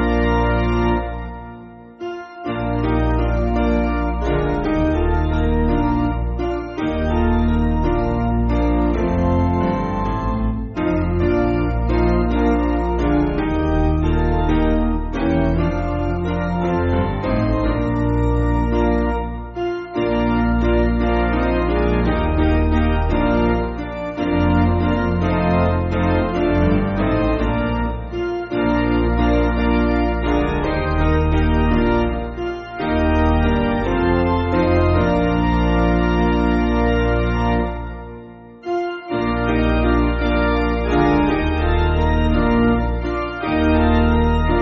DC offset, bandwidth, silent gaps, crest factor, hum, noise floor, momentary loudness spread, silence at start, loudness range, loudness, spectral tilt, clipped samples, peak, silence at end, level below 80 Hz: under 0.1%; 6.6 kHz; none; 14 dB; none; -38 dBFS; 7 LU; 0 s; 3 LU; -19 LUFS; -7 dB/octave; under 0.1%; -4 dBFS; 0 s; -24 dBFS